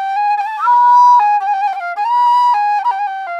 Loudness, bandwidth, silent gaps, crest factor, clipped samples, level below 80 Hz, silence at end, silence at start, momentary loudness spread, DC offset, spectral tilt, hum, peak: -12 LUFS; 8.2 kHz; none; 10 dB; under 0.1%; -72 dBFS; 0 s; 0 s; 10 LU; under 0.1%; 2 dB/octave; none; -2 dBFS